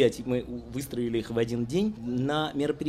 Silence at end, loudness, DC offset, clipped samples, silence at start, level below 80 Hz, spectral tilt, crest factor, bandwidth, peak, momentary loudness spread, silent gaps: 0 s; -30 LUFS; under 0.1%; under 0.1%; 0 s; -52 dBFS; -6 dB/octave; 18 dB; 15 kHz; -10 dBFS; 6 LU; none